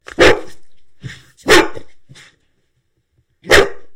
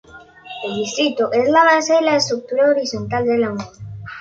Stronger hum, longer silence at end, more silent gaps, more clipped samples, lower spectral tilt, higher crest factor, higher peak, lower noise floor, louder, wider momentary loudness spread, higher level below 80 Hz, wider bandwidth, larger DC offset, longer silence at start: neither; about the same, 0 s vs 0 s; neither; first, 0.1% vs under 0.1%; about the same, -3 dB/octave vs -4 dB/octave; about the same, 16 dB vs 16 dB; about the same, 0 dBFS vs -2 dBFS; first, -64 dBFS vs -39 dBFS; first, -12 LUFS vs -17 LUFS; first, 23 LU vs 18 LU; first, -36 dBFS vs -54 dBFS; first, 18 kHz vs 7.8 kHz; neither; about the same, 0.2 s vs 0.15 s